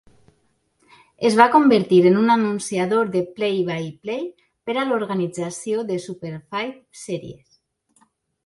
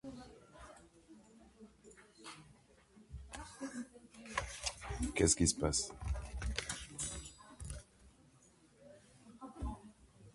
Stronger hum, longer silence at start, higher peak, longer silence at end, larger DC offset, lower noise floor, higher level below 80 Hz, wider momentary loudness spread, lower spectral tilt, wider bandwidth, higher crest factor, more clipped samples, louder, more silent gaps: neither; first, 1.2 s vs 0.05 s; first, 0 dBFS vs -16 dBFS; first, 1.15 s vs 0.05 s; neither; about the same, -66 dBFS vs -67 dBFS; second, -64 dBFS vs -50 dBFS; second, 17 LU vs 28 LU; first, -5.5 dB/octave vs -3.5 dB/octave; about the same, 11.5 kHz vs 11.5 kHz; second, 20 dB vs 26 dB; neither; first, -20 LUFS vs -39 LUFS; neither